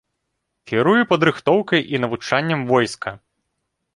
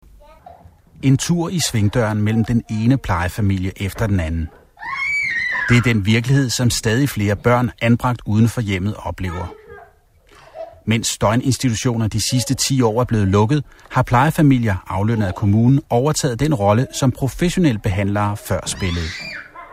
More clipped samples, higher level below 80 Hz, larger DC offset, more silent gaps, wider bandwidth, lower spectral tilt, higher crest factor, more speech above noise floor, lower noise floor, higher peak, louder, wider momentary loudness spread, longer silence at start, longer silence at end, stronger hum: neither; second, -58 dBFS vs -38 dBFS; neither; neither; second, 11.5 kHz vs 16 kHz; about the same, -5.5 dB/octave vs -5.5 dB/octave; about the same, 20 dB vs 16 dB; first, 57 dB vs 34 dB; first, -76 dBFS vs -51 dBFS; about the same, 0 dBFS vs -2 dBFS; about the same, -18 LUFS vs -18 LUFS; about the same, 8 LU vs 9 LU; first, 0.65 s vs 0.5 s; first, 0.8 s vs 0 s; neither